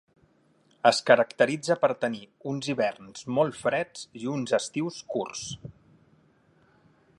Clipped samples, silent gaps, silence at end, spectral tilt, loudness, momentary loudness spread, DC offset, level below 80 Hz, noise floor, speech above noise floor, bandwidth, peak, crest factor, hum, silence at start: under 0.1%; none; 1.5 s; -4.5 dB/octave; -27 LUFS; 15 LU; under 0.1%; -68 dBFS; -64 dBFS; 38 dB; 11.5 kHz; -4 dBFS; 24 dB; none; 0.85 s